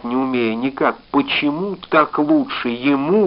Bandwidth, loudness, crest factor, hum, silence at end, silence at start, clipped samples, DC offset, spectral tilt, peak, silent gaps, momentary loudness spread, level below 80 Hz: 5.6 kHz; -18 LUFS; 16 dB; none; 0 s; 0 s; under 0.1%; under 0.1%; -3.5 dB/octave; -2 dBFS; none; 5 LU; -56 dBFS